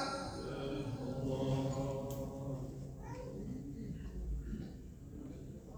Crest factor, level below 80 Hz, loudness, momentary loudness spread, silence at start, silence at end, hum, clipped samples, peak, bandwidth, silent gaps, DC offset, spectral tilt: 16 dB; -50 dBFS; -43 LUFS; 13 LU; 0 s; 0 s; none; under 0.1%; -24 dBFS; over 20 kHz; none; under 0.1%; -7 dB/octave